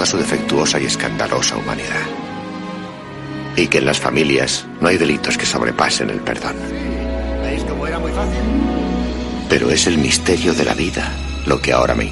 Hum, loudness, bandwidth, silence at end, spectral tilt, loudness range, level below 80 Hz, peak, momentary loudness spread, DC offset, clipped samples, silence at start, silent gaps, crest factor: none; -17 LUFS; 11.5 kHz; 0 s; -3.5 dB/octave; 4 LU; -30 dBFS; 0 dBFS; 10 LU; under 0.1%; under 0.1%; 0 s; none; 18 dB